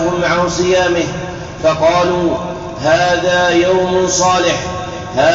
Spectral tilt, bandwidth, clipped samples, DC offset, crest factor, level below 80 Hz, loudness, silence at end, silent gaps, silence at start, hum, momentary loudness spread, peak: -3.5 dB/octave; 7.8 kHz; under 0.1%; 0.1%; 12 dB; -38 dBFS; -14 LUFS; 0 s; none; 0 s; none; 9 LU; -2 dBFS